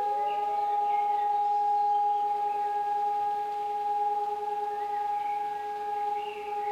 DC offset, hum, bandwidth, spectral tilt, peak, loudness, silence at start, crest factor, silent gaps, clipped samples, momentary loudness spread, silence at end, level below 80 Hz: under 0.1%; none; 11.5 kHz; -3 dB/octave; -20 dBFS; -29 LUFS; 0 s; 10 dB; none; under 0.1%; 6 LU; 0 s; -72 dBFS